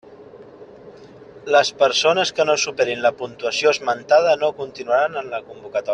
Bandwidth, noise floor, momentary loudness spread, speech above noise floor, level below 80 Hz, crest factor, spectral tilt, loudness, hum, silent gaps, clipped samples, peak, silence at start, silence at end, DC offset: 10 kHz; -42 dBFS; 12 LU; 23 dB; -64 dBFS; 18 dB; -2 dB/octave; -19 LUFS; none; none; under 0.1%; -2 dBFS; 0.1 s; 0 s; under 0.1%